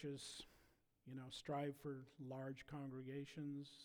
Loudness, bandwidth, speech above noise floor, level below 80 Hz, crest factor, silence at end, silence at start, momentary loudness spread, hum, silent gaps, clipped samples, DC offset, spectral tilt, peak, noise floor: -51 LUFS; over 20 kHz; 25 dB; -78 dBFS; 16 dB; 0 s; 0 s; 10 LU; none; none; under 0.1%; under 0.1%; -5.5 dB/octave; -36 dBFS; -76 dBFS